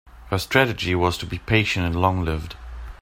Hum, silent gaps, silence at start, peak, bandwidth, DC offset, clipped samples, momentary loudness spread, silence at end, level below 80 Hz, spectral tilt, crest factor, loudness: none; none; 0.05 s; -2 dBFS; 16 kHz; under 0.1%; under 0.1%; 14 LU; 0.05 s; -38 dBFS; -5.5 dB/octave; 22 dB; -22 LUFS